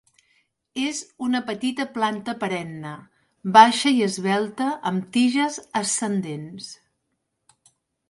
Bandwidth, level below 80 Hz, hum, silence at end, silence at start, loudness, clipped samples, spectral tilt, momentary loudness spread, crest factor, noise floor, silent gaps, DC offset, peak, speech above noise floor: 11.5 kHz; -70 dBFS; none; 1.35 s; 0.75 s; -22 LUFS; under 0.1%; -3.5 dB/octave; 19 LU; 22 dB; -76 dBFS; none; under 0.1%; -2 dBFS; 54 dB